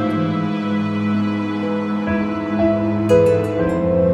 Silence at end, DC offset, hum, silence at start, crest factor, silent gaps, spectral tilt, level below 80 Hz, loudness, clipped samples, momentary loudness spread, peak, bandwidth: 0 s; under 0.1%; none; 0 s; 16 dB; none; -8 dB/octave; -42 dBFS; -19 LUFS; under 0.1%; 7 LU; -2 dBFS; 11.5 kHz